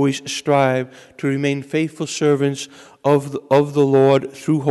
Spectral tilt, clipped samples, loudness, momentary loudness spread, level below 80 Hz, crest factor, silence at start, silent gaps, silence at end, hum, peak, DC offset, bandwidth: -6 dB/octave; under 0.1%; -18 LUFS; 10 LU; -64 dBFS; 14 dB; 0 s; none; 0 s; none; -4 dBFS; under 0.1%; 12 kHz